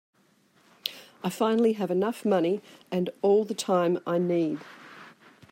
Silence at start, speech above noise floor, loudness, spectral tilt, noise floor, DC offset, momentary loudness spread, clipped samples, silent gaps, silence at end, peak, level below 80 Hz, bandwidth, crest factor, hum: 0.85 s; 38 dB; -27 LUFS; -6 dB/octave; -64 dBFS; under 0.1%; 12 LU; under 0.1%; none; 0.45 s; -8 dBFS; -76 dBFS; 16 kHz; 20 dB; none